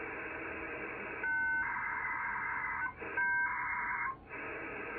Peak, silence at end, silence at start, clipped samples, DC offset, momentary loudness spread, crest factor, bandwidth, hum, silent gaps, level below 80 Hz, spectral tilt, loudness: -24 dBFS; 0 s; 0 s; under 0.1%; under 0.1%; 9 LU; 14 dB; 4.5 kHz; none; none; -64 dBFS; -3 dB/octave; -36 LUFS